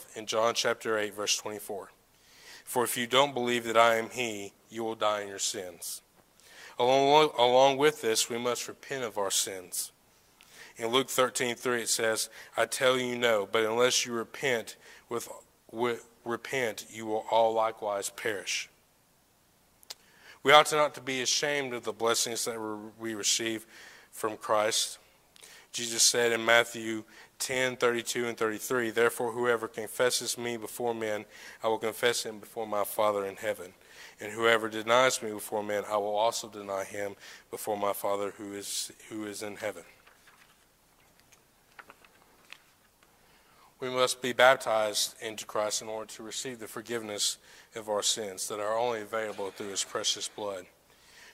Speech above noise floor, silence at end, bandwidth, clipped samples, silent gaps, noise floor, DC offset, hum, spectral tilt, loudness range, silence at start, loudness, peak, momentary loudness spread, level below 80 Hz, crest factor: 36 dB; 0.05 s; 16 kHz; under 0.1%; none; -66 dBFS; under 0.1%; none; -2 dB/octave; 7 LU; 0 s; -29 LUFS; -4 dBFS; 16 LU; -74 dBFS; 26 dB